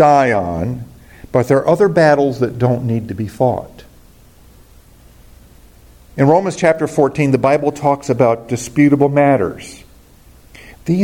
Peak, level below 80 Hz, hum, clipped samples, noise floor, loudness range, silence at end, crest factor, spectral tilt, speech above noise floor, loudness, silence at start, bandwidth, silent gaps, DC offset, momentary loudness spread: 0 dBFS; -46 dBFS; none; under 0.1%; -44 dBFS; 8 LU; 0 s; 16 dB; -7 dB/octave; 30 dB; -15 LUFS; 0 s; 17 kHz; none; under 0.1%; 14 LU